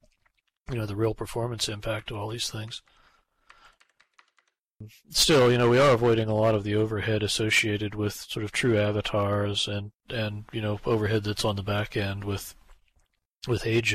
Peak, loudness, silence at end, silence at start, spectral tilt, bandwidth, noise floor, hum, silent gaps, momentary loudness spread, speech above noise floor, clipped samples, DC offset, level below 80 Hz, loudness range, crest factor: -10 dBFS; -26 LUFS; 0 s; 0.7 s; -4.5 dB/octave; 15.5 kHz; -72 dBFS; none; 13.25-13.29 s, 13.37-13.41 s; 14 LU; 46 dB; under 0.1%; under 0.1%; -50 dBFS; 11 LU; 16 dB